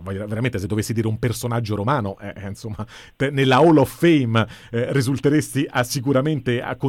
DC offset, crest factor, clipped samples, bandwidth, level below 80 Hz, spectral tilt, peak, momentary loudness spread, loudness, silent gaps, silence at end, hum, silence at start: under 0.1%; 14 dB; under 0.1%; 16.5 kHz; -48 dBFS; -6 dB/octave; -6 dBFS; 16 LU; -20 LUFS; none; 0 s; none; 0 s